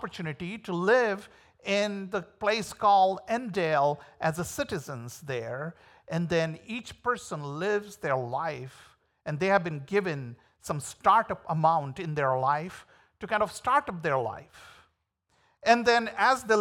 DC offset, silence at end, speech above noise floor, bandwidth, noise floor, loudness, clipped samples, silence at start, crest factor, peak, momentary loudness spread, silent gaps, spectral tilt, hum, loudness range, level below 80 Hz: under 0.1%; 0 s; 46 dB; 18.5 kHz; -74 dBFS; -28 LUFS; under 0.1%; 0 s; 20 dB; -8 dBFS; 14 LU; none; -5 dB/octave; none; 5 LU; -64 dBFS